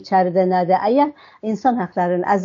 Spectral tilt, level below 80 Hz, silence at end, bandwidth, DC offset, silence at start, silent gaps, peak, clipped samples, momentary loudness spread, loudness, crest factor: -6 dB/octave; -64 dBFS; 0 s; 7.4 kHz; under 0.1%; 0 s; none; -4 dBFS; under 0.1%; 6 LU; -18 LUFS; 14 dB